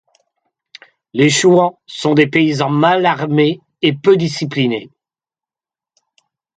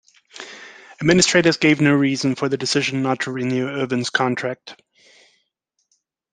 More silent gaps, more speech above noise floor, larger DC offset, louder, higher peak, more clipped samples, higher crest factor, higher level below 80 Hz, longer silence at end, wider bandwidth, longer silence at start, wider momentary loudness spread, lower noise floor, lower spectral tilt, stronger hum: neither; first, over 77 dB vs 54 dB; neither; first, -14 LUFS vs -19 LUFS; about the same, 0 dBFS vs -2 dBFS; neither; about the same, 16 dB vs 20 dB; about the same, -60 dBFS vs -56 dBFS; about the same, 1.7 s vs 1.6 s; about the same, 9.4 kHz vs 9.8 kHz; first, 1.15 s vs 0.35 s; second, 8 LU vs 21 LU; first, under -90 dBFS vs -73 dBFS; about the same, -5 dB/octave vs -4 dB/octave; neither